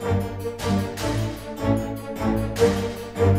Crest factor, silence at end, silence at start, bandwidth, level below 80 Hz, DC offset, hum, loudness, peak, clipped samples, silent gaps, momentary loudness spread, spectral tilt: 18 dB; 0 s; 0 s; 16 kHz; -38 dBFS; under 0.1%; none; -25 LUFS; -4 dBFS; under 0.1%; none; 9 LU; -6.5 dB/octave